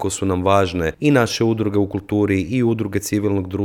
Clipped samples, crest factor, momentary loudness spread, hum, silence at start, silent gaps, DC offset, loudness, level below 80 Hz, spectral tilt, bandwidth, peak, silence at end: under 0.1%; 16 dB; 5 LU; none; 0 s; none; under 0.1%; -19 LUFS; -44 dBFS; -6 dB/octave; 18 kHz; -2 dBFS; 0 s